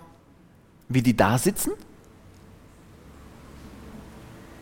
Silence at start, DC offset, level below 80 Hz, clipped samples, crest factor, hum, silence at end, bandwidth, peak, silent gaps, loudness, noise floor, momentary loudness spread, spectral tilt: 0.9 s; under 0.1%; -50 dBFS; under 0.1%; 26 dB; none; 0.05 s; 17 kHz; -4 dBFS; none; -23 LUFS; -54 dBFS; 27 LU; -5.5 dB/octave